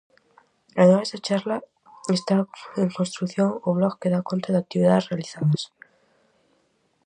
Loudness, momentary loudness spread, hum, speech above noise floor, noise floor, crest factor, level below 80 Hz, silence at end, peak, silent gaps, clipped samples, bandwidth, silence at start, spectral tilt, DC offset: -23 LUFS; 12 LU; none; 45 dB; -67 dBFS; 20 dB; -68 dBFS; 1.4 s; -4 dBFS; none; under 0.1%; 9.8 kHz; 0.75 s; -6.5 dB/octave; under 0.1%